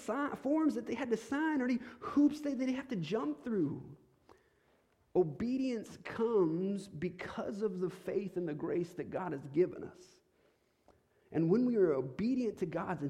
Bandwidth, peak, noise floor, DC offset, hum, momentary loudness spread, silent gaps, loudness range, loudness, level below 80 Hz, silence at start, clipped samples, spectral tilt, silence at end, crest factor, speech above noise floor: 12.5 kHz; -18 dBFS; -73 dBFS; under 0.1%; none; 9 LU; none; 4 LU; -35 LUFS; -70 dBFS; 0 s; under 0.1%; -7.5 dB/octave; 0 s; 16 dB; 38 dB